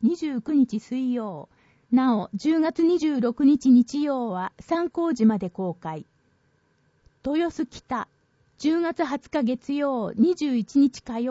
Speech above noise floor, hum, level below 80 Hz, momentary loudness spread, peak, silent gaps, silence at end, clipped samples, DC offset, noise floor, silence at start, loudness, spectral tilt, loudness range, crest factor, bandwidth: 43 dB; none; -62 dBFS; 11 LU; -10 dBFS; none; 0 s; under 0.1%; under 0.1%; -66 dBFS; 0 s; -24 LUFS; -6.5 dB/octave; 7 LU; 14 dB; 8 kHz